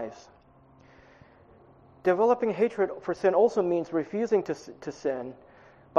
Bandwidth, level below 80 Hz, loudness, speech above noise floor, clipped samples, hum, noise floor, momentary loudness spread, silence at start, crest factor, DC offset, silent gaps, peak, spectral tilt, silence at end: 7.6 kHz; -68 dBFS; -27 LUFS; 30 dB; under 0.1%; none; -57 dBFS; 13 LU; 0 s; 22 dB; under 0.1%; none; -6 dBFS; -6.5 dB/octave; 0 s